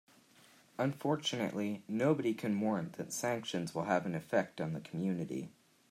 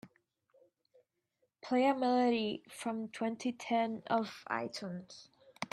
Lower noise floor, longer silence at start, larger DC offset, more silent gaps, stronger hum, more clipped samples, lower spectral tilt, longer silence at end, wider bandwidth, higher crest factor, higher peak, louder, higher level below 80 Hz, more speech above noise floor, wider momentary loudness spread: second, -64 dBFS vs -81 dBFS; first, 0.8 s vs 0.05 s; neither; neither; neither; neither; about the same, -5.5 dB/octave vs -5 dB/octave; first, 0.4 s vs 0.05 s; first, 15.5 kHz vs 12.5 kHz; about the same, 20 dB vs 18 dB; about the same, -16 dBFS vs -18 dBFS; about the same, -36 LUFS vs -35 LUFS; about the same, -78 dBFS vs -82 dBFS; second, 28 dB vs 47 dB; second, 7 LU vs 16 LU